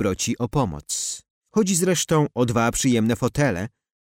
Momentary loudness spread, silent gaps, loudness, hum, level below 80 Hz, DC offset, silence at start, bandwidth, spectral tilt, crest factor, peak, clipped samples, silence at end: 8 LU; 1.30-1.41 s; -22 LUFS; none; -46 dBFS; under 0.1%; 0 s; 16.5 kHz; -4.5 dB/octave; 14 dB; -8 dBFS; under 0.1%; 0.5 s